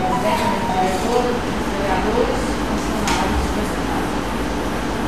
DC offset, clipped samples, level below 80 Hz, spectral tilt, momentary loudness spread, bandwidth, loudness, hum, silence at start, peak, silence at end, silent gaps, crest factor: 2%; under 0.1%; -30 dBFS; -5 dB/octave; 4 LU; 15.5 kHz; -20 LUFS; none; 0 s; -4 dBFS; 0 s; none; 16 dB